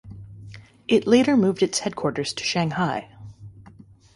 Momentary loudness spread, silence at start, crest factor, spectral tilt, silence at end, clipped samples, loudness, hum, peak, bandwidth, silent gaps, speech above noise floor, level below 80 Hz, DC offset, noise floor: 25 LU; 0.05 s; 20 dB; -5 dB/octave; 0.55 s; under 0.1%; -22 LUFS; none; -4 dBFS; 11.5 kHz; none; 28 dB; -56 dBFS; under 0.1%; -49 dBFS